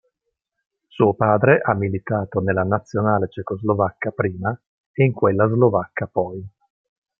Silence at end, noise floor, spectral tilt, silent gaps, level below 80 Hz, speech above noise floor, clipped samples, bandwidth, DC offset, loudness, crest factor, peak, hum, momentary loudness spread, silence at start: 0.7 s; -78 dBFS; -10 dB/octave; 4.67-4.94 s; -58 dBFS; 59 dB; under 0.1%; 6.8 kHz; under 0.1%; -20 LUFS; 18 dB; -2 dBFS; none; 10 LU; 0.95 s